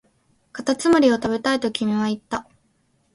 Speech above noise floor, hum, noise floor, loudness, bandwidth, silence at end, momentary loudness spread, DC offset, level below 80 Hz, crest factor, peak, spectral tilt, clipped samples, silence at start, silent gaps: 45 dB; none; -65 dBFS; -21 LUFS; 11.5 kHz; 0.75 s; 14 LU; under 0.1%; -58 dBFS; 18 dB; -4 dBFS; -4.5 dB/octave; under 0.1%; 0.55 s; none